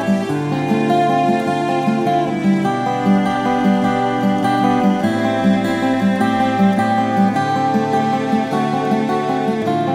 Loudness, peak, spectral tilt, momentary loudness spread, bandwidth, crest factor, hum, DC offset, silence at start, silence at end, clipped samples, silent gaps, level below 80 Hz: -17 LUFS; -4 dBFS; -7 dB/octave; 3 LU; 13.5 kHz; 12 dB; none; under 0.1%; 0 s; 0 s; under 0.1%; none; -52 dBFS